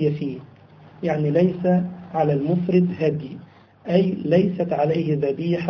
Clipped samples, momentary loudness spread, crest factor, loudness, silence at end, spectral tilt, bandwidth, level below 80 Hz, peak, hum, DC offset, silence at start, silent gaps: under 0.1%; 12 LU; 18 dB; -22 LUFS; 0 s; -10 dB/octave; 6.2 kHz; -58 dBFS; -4 dBFS; none; under 0.1%; 0 s; none